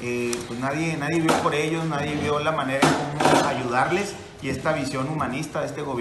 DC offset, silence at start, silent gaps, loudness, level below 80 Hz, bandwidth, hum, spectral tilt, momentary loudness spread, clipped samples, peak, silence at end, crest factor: under 0.1%; 0 s; none; -24 LUFS; -54 dBFS; 12.5 kHz; none; -5 dB/octave; 8 LU; under 0.1%; -2 dBFS; 0 s; 22 dB